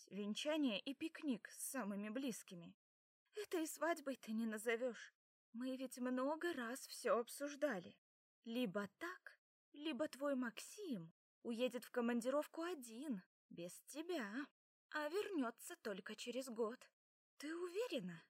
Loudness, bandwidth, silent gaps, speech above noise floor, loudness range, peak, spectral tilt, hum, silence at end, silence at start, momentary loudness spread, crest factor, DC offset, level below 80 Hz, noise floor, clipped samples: -46 LUFS; 16 kHz; 2.74-3.26 s, 5.15-5.53 s, 7.98-8.42 s, 9.38-9.72 s, 11.11-11.42 s, 13.26-13.49 s, 14.51-14.89 s, 16.93-17.37 s; over 45 dB; 3 LU; -26 dBFS; -4 dB/octave; none; 0.1 s; 0 s; 13 LU; 20 dB; under 0.1%; under -90 dBFS; under -90 dBFS; under 0.1%